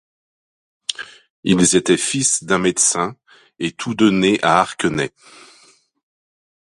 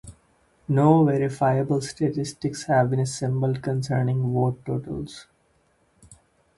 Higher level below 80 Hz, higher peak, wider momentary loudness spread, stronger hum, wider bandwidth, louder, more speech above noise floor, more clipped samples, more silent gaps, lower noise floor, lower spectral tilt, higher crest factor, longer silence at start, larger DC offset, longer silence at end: about the same, -54 dBFS vs -56 dBFS; first, 0 dBFS vs -4 dBFS; about the same, 13 LU vs 12 LU; neither; about the same, 11.5 kHz vs 11.5 kHz; first, -17 LUFS vs -24 LUFS; second, 36 dB vs 42 dB; neither; first, 1.30-1.43 s vs none; second, -53 dBFS vs -65 dBFS; second, -3.5 dB/octave vs -7 dB/octave; about the same, 20 dB vs 20 dB; first, 0.9 s vs 0.05 s; neither; first, 1.65 s vs 0.45 s